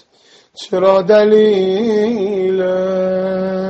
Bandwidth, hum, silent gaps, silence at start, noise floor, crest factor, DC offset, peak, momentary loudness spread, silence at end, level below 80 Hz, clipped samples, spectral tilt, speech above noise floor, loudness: 8 kHz; none; none; 0.6 s; -49 dBFS; 14 dB; under 0.1%; 0 dBFS; 8 LU; 0 s; -56 dBFS; under 0.1%; -7 dB/octave; 37 dB; -14 LUFS